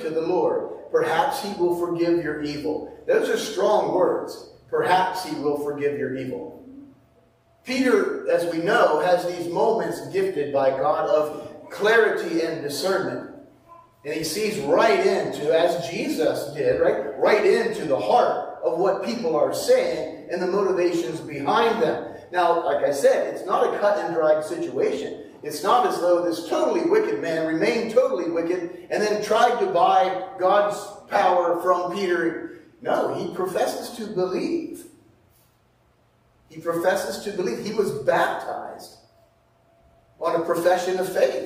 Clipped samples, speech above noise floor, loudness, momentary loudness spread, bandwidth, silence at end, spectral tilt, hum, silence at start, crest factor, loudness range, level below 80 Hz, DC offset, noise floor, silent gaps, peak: under 0.1%; 39 dB; -23 LUFS; 10 LU; 15.5 kHz; 0 s; -4.5 dB/octave; none; 0 s; 18 dB; 5 LU; -62 dBFS; under 0.1%; -61 dBFS; none; -4 dBFS